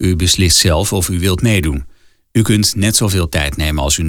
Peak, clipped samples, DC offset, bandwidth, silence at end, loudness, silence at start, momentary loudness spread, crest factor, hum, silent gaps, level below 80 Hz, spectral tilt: -2 dBFS; under 0.1%; under 0.1%; 18.5 kHz; 0 s; -13 LUFS; 0 s; 7 LU; 12 dB; none; none; -28 dBFS; -4 dB/octave